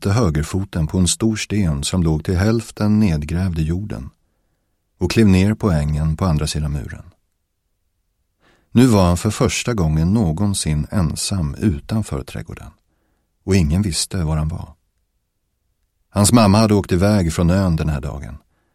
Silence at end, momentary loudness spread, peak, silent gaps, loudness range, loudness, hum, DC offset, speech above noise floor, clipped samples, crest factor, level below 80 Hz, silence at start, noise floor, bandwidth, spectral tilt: 0.35 s; 15 LU; 0 dBFS; none; 5 LU; -18 LUFS; none; under 0.1%; 53 dB; under 0.1%; 18 dB; -32 dBFS; 0 s; -70 dBFS; 15.5 kHz; -6 dB/octave